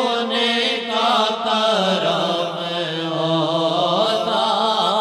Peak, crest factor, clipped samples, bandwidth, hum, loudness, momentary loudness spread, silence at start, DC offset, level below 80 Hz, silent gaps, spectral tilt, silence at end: -6 dBFS; 14 dB; under 0.1%; 14 kHz; none; -19 LUFS; 5 LU; 0 s; under 0.1%; -72 dBFS; none; -4 dB/octave; 0 s